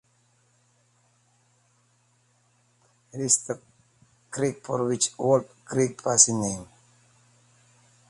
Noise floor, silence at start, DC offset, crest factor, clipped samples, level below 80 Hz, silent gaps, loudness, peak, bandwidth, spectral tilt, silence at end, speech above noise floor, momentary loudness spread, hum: -66 dBFS; 3.15 s; under 0.1%; 28 dB; under 0.1%; -64 dBFS; none; -24 LUFS; -2 dBFS; 11.5 kHz; -3.5 dB/octave; 1.45 s; 41 dB; 18 LU; none